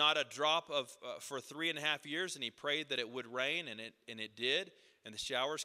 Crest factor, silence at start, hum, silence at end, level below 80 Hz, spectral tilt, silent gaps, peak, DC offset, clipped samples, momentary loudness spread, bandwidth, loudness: 22 dB; 0 s; none; 0 s; -82 dBFS; -2 dB/octave; none; -16 dBFS; under 0.1%; under 0.1%; 13 LU; 15 kHz; -37 LUFS